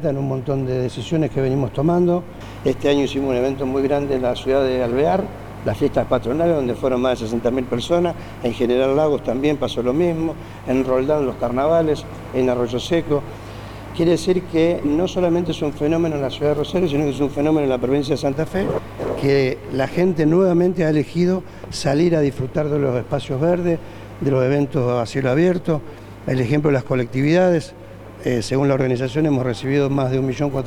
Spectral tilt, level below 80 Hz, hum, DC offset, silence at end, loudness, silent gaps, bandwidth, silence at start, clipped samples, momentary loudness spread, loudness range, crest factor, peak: -7 dB/octave; -42 dBFS; none; under 0.1%; 0 s; -20 LUFS; none; 19 kHz; 0 s; under 0.1%; 7 LU; 2 LU; 16 dB; -4 dBFS